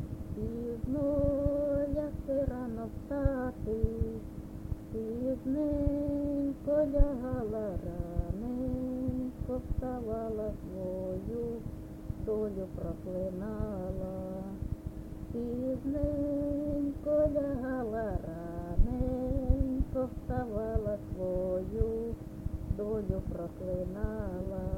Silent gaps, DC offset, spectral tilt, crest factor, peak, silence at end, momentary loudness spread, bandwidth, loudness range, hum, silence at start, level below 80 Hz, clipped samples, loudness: none; under 0.1%; -10 dB/octave; 22 dB; -12 dBFS; 0 s; 9 LU; 16.5 kHz; 5 LU; none; 0 s; -40 dBFS; under 0.1%; -35 LUFS